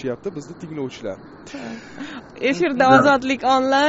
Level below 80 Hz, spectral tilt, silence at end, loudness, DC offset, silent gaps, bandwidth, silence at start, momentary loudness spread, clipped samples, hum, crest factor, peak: -56 dBFS; -3 dB/octave; 0 s; -18 LUFS; under 0.1%; none; 8 kHz; 0 s; 21 LU; under 0.1%; none; 20 dB; 0 dBFS